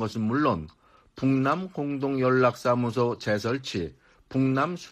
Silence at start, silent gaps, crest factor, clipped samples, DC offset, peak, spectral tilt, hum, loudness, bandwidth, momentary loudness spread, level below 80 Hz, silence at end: 0 s; none; 18 dB; under 0.1%; under 0.1%; -10 dBFS; -7 dB/octave; none; -26 LUFS; 14 kHz; 10 LU; -58 dBFS; 0 s